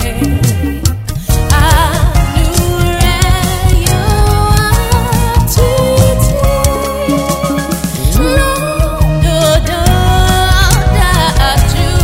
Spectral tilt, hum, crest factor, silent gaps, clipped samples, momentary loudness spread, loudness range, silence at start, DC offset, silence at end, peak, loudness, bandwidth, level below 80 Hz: -5 dB/octave; none; 10 dB; none; under 0.1%; 5 LU; 2 LU; 0 s; under 0.1%; 0 s; 0 dBFS; -11 LUFS; 16.5 kHz; -14 dBFS